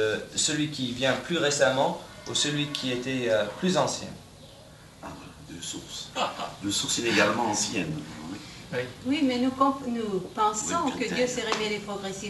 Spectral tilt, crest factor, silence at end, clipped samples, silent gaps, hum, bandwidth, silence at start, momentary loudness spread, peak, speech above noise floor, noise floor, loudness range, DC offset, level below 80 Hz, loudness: -3 dB/octave; 20 dB; 0 s; under 0.1%; none; none; 12 kHz; 0 s; 15 LU; -8 dBFS; 22 dB; -49 dBFS; 5 LU; under 0.1%; -58 dBFS; -27 LUFS